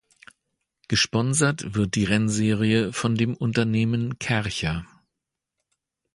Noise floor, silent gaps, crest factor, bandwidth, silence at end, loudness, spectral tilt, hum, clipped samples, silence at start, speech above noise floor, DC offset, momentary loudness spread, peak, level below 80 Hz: -84 dBFS; none; 18 dB; 11.5 kHz; 1.3 s; -23 LUFS; -5 dB/octave; none; under 0.1%; 0.9 s; 61 dB; under 0.1%; 5 LU; -6 dBFS; -48 dBFS